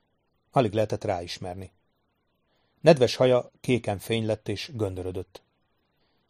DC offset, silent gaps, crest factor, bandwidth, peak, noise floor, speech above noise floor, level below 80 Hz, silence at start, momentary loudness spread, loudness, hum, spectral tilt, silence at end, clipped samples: under 0.1%; none; 24 dB; 15 kHz; -2 dBFS; -73 dBFS; 48 dB; -60 dBFS; 0.55 s; 15 LU; -26 LUFS; none; -6 dB/octave; 1.05 s; under 0.1%